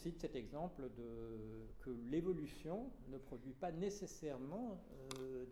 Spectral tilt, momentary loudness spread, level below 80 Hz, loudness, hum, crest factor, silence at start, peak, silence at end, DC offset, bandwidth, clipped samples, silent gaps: -6.5 dB/octave; 10 LU; -60 dBFS; -48 LUFS; none; 20 dB; 0 s; -28 dBFS; 0 s; under 0.1%; 17.5 kHz; under 0.1%; none